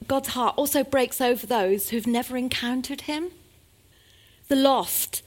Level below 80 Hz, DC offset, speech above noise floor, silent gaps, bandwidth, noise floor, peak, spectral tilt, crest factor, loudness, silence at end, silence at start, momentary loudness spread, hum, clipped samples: -56 dBFS; under 0.1%; 33 dB; none; 17 kHz; -57 dBFS; -4 dBFS; -3 dB/octave; 22 dB; -24 LUFS; 0.05 s; 0 s; 9 LU; none; under 0.1%